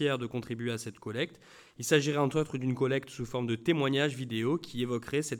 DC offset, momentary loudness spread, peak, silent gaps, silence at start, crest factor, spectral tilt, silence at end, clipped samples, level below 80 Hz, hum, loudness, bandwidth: under 0.1%; 9 LU; -12 dBFS; none; 0 s; 20 dB; -5 dB/octave; 0 s; under 0.1%; -64 dBFS; none; -31 LUFS; 18.5 kHz